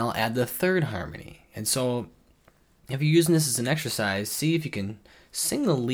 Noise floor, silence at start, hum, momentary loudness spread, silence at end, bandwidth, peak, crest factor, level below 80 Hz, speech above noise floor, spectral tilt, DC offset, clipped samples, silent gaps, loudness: -61 dBFS; 0 s; none; 15 LU; 0 s; over 20 kHz; -8 dBFS; 18 dB; -58 dBFS; 35 dB; -4.5 dB/octave; under 0.1%; under 0.1%; none; -26 LUFS